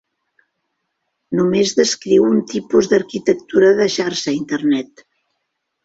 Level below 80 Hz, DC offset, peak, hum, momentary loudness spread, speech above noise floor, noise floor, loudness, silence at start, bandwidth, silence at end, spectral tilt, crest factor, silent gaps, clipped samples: -58 dBFS; under 0.1%; -2 dBFS; none; 7 LU; 58 dB; -74 dBFS; -16 LUFS; 1.3 s; 8 kHz; 1 s; -4.5 dB/octave; 16 dB; none; under 0.1%